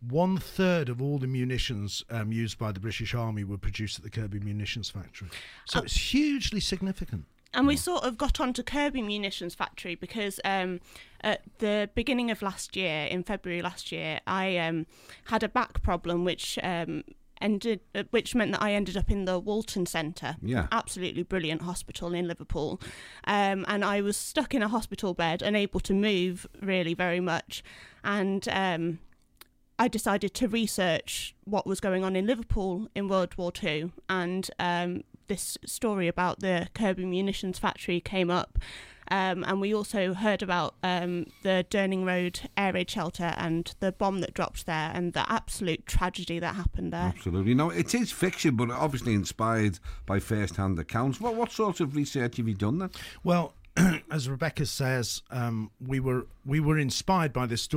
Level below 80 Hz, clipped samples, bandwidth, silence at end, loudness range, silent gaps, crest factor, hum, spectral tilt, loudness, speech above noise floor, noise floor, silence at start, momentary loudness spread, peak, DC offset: -42 dBFS; under 0.1%; 16.5 kHz; 0 s; 3 LU; none; 16 dB; none; -5 dB/octave; -30 LUFS; 29 dB; -58 dBFS; 0 s; 8 LU; -12 dBFS; under 0.1%